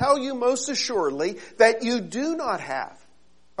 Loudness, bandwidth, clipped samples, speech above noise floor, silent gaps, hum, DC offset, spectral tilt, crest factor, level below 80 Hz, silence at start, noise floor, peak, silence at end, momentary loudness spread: -24 LUFS; 11 kHz; under 0.1%; 39 dB; none; none; 0.3%; -3 dB/octave; 20 dB; -64 dBFS; 0 s; -63 dBFS; -4 dBFS; 0.7 s; 12 LU